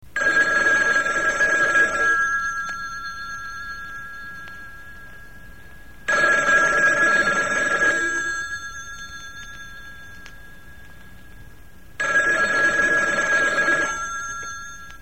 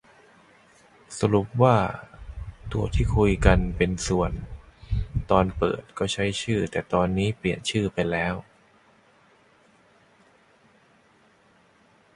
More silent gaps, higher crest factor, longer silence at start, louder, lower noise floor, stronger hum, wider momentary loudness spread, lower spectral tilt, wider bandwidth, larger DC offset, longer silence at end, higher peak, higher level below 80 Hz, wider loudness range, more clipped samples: neither; second, 16 dB vs 22 dB; second, 0.15 s vs 1.1 s; first, -19 LUFS vs -25 LUFS; second, -47 dBFS vs -60 dBFS; neither; about the same, 20 LU vs 18 LU; second, -2 dB/octave vs -6 dB/octave; first, 16.5 kHz vs 11.5 kHz; first, 0.8% vs under 0.1%; second, 0.05 s vs 3.75 s; second, -8 dBFS vs -4 dBFS; second, -48 dBFS vs -36 dBFS; first, 15 LU vs 7 LU; neither